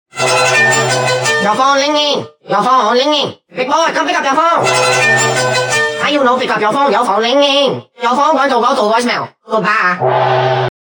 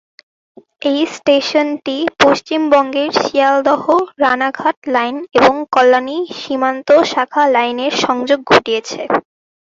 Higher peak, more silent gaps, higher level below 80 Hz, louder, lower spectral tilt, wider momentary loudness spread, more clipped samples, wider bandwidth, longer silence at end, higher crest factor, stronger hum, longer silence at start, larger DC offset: about the same, 0 dBFS vs 0 dBFS; second, none vs 4.77-4.82 s; second, -64 dBFS vs -56 dBFS; about the same, -12 LUFS vs -14 LUFS; about the same, -3 dB/octave vs -3.5 dB/octave; about the same, 6 LU vs 7 LU; neither; first, 19.5 kHz vs 7.8 kHz; second, 0.15 s vs 0.45 s; about the same, 12 dB vs 14 dB; neither; second, 0.15 s vs 0.85 s; neither